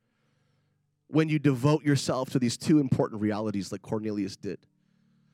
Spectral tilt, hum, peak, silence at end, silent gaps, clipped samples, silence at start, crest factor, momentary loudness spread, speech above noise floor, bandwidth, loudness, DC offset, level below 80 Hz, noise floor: -6.5 dB/octave; none; -12 dBFS; 0.8 s; none; under 0.1%; 1.1 s; 18 dB; 11 LU; 47 dB; 14.5 kHz; -27 LUFS; under 0.1%; -68 dBFS; -73 dBFS